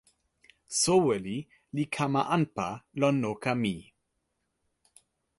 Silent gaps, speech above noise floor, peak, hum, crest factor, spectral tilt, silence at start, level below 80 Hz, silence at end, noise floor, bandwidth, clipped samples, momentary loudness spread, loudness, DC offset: none; 51 dB; -12 dBFS; none; 20 dB; -4.5 dB/octave; 0.7 s; -64 dBFS; 1.55 s; -79 dBFS; 11.5 kHz; under 0.1%; 13 LU; -29 LUFS; under 0.1%